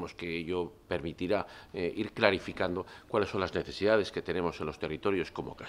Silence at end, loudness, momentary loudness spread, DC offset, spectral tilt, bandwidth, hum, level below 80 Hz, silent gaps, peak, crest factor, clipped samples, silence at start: 0 s; -33 LUFS; 9 LU; under 0.1%; -6 dB/octave; 12.5 kHz; none; -60 dBFS; none; -6 dBFS; 26 dB; under 0.1%; 0 s